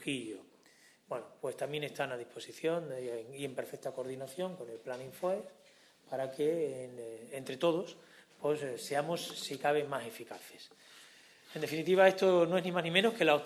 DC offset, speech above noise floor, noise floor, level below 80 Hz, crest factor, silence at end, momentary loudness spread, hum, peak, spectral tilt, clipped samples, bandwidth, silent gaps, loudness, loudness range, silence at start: under 0.1%; 30 dB; -64 dBFS; -82 dBFS; 24 dB; 0 s; 19 LU; none; -12 dBFS; -4.5 dB/octave; under 0.1%; 14 kHz; none; -34 LUFS; 8 LU; 0 s